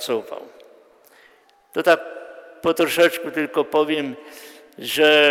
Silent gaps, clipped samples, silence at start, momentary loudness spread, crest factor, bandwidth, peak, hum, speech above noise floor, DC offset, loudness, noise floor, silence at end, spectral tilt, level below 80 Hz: none; under 0.1%; 0 s; 22 LU; 18 dB; 16.5 kHz; -4 dBFS; none; 36 dB; under 0.1%; -20 LUFS; -55 dBFS; 0 s; -3 dB/octave; -66 dBFS